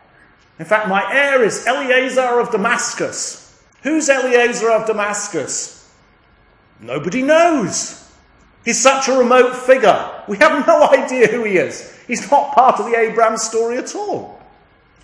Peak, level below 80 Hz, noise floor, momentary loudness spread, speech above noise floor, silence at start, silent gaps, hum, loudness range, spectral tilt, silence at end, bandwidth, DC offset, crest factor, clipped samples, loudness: 0 dBFS; -60 dBFS; -52 dBFS; 12 LU; 37 dB; 0.6 s; none; none; 5 LU; -3 dB/octave; 0.65 s; 10.5 kHz; under 0.1%; 16 dB; under 0.1%; -15 LUFS